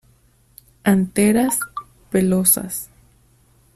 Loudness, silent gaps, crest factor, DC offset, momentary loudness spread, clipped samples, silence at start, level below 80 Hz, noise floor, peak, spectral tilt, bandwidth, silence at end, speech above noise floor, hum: -18 LUFS; none; 20 dB; under 0.1%; 14 LU; under 0.1%; 0.85 s; -52 dBFS; -56 dBFS; 0 dBFS; -5 dB/octave; 14.5 kHz; 0.9 s; 39 dB; none